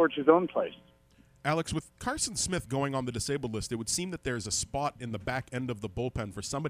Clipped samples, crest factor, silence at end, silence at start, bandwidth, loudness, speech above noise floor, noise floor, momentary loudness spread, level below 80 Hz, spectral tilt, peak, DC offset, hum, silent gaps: under 0.1%; 24 dB; 0 s; 0 s; 15.5 kHz; -31 LUFS; 30 dB; -62 dBFS; 10 LU; -52 dBFS; -4 dB/octave; -8 dBFS; under 0.1%; none; none